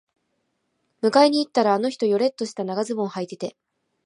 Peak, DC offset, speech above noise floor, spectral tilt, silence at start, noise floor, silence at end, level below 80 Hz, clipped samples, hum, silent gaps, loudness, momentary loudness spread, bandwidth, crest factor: -4 dBFS; under 0.1%; 52 dB; -5 dB/octave; 1.05 s; -73 dBFS; 0.55 s; -78 dBFS; under 0.1%; none; none; -22 LUFS; 13 LU; 11 kHz; 20 dB